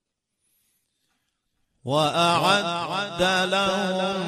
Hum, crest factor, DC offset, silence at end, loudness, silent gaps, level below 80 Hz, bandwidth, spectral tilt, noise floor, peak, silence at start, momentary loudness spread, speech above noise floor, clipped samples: none; 20 dB; under 0.1%; 0 s; -22 LUFS; none; -58 dBFS; 13 kHz; -4 dB/octave; -76 dBFS; -6 dBFS; 1.85 s; 7 LU; 53 dB; under 0.1%